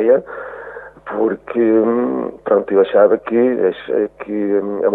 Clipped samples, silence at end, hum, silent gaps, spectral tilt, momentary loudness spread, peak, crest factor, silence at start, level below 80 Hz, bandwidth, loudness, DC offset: under 0.1%; 0 s; none; none; -9.5 dB/octave; 16 LU; -2 dBFS; 14 dB; 0 s; -56 dBFS; 4 kHz; -16 LUFS; under 0.1%